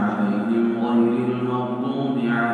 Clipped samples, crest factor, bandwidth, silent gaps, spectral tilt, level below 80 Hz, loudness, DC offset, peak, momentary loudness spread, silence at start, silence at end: under 0.1%; 12 dB; 4.6 kHz; none; -8.5 dB/octave; -72 dBFS; -22 LUFS; under 0.1%; -8 dBFS; 5 LU; 0 s; 0 s